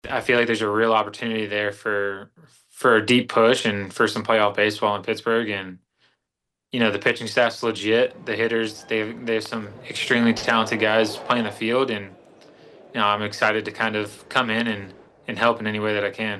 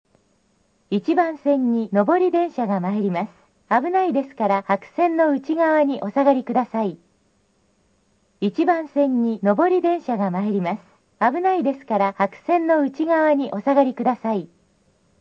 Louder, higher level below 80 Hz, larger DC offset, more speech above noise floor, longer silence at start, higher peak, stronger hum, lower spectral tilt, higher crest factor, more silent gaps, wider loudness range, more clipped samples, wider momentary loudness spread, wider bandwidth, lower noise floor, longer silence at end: about the same, -22 LUFS vs -21 LUFS; first, -64 dBFS vs -72 dBFS; neither; first, 60 dB vs 44 dB; second, 0.05 s vs 0.9 s; about the same, -4 dBFS vs -4 dBFS; neither; second, -4.5 dB/octave vs -8.5 dB/octave; about the same, 20 dB vs 16 dB; neither; about the same, 3 LU vs 3 LU; neither; first, 10 LU vs 7 LU; first, 12.5 kHz vs 7.2 kHz; first, -82 dBFS vs -64 dBFS; second, 0 s vs 0.75 s